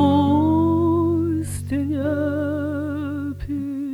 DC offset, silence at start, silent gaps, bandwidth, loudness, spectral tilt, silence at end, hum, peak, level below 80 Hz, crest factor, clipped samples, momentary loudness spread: under 0.1%; 0 s; none; 13 kHz; -22 LUFS; -7.5 dB/octave; 0 s; none; -6 dBFS; -44 dBFS; 14 dB; under 0.1%; 10 LU